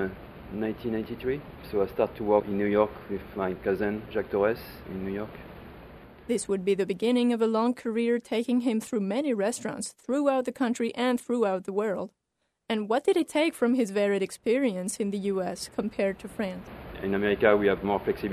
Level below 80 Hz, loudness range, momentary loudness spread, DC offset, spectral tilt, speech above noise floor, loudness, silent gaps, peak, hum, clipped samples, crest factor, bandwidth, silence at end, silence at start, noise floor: -54 dBFS; 3 LU; 11 LU; under 0.1%; -5.5 dB/octave; 52 dB; -28 LUFS; none; -8 dBFS; none; under 0.1%; 20 dB; 13.5 kHz; 0 s; 0 s; -79 dBFS